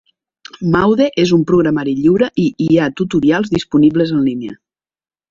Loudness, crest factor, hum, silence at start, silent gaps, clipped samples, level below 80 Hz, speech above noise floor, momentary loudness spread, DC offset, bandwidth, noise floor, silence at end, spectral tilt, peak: -14 LUFS; 14 dB; none; 0.6 s; none; under 0.1%; -46 dBFS; 28 dB; 5 LU; under 0.1%; 7.6 kHz; -42 dBFS; 0.75 s; -7 dB/octave; -2 dBFS